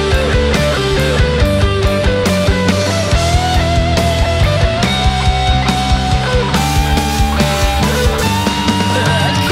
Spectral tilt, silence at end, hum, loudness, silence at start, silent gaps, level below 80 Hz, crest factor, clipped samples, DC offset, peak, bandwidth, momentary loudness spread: -5 dB/octave; 0 s; none; -13 LUFS; 0 s; none; -18 dBFS; 12 dB; under 0.1%; under 0.1%; 0 dBFS; 16.5 kHz; 1 LU